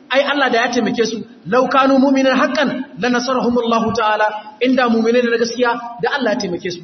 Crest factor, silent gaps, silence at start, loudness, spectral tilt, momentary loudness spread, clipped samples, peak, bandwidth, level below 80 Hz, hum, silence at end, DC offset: 14 dB; none; 0.1 s; -16 LUFS; -4.5 dB/octave; 7 LU; under 0.1%; -2 dBFS; 6.4 kHz; -56 dBFS; none; 0 s; under 0.1%